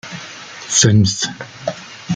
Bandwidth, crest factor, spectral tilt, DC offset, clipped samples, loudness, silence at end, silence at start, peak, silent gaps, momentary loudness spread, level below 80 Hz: 9.6 kHz; 16 dB; -3.5 dB/octave; under 0.1%; under 0.1%; -16 LUFS; 0 s; 0.05 s; -2 dBFS; none; 20 LU; -50 dBFS